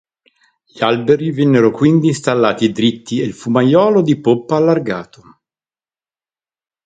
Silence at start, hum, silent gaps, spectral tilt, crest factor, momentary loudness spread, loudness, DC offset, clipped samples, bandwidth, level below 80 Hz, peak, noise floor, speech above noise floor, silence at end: 0.75 s; none; none; -6.5 dB/octave; 16 dB; 8 LU; -14 LUFS; under 0.1%; under 0.1%; 9.4 kHz; -58 dBFS; 0 dBFS; under -90 dBFS; over 76 dB; 1.8 s